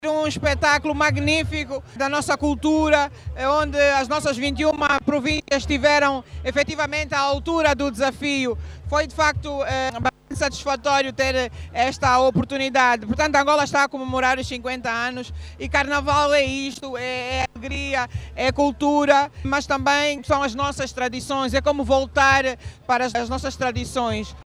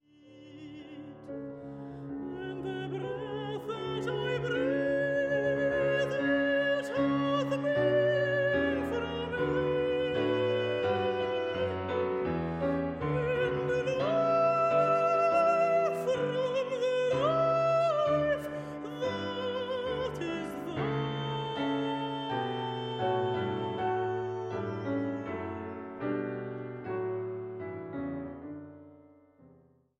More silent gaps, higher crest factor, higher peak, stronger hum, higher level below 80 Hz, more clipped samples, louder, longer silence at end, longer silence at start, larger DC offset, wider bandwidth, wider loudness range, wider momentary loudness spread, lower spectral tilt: neither; about the same, 18 dB vs 16 dB; first, -4 dBFS vs -16 dBFS; neither; first, -38 dBFS vs -60 dBFS; neither; first, -21 LUFS vs -31 LUFS; second, 0.05 s vs 1.05 s; second, 0 s vs 0.25 s; neither; about the same, 13 kHz vs 13 kHz; second, 3 LU vs 10 LU; second, 9 LU vs 13 LU; second, -4 dB/octave vs -6.5 dB/octave